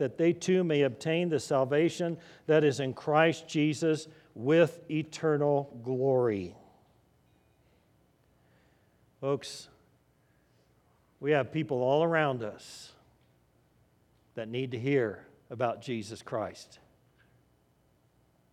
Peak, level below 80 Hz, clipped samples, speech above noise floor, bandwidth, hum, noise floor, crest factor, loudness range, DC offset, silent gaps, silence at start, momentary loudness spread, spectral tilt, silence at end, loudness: -10 dBFS; -76 dBFS; under 0.1%; 39 dB; 13 kHz; none; -68 dBFS; 22 dB; 14 LU; under 0.1%; none; 0 s; 16 LU; -6 dB/octave; 1.9 s; -30 LUFS